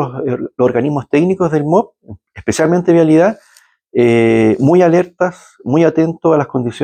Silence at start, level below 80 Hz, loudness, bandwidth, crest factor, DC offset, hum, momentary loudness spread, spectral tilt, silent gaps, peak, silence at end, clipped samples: 0 s; -52 dBFS; -13 LUFS; 9.4 kHz; 12 dB; under 0.1%; none; 10 LU; -7.5 dB/octave; none; 0 dBFS; 0 s; under 0.1%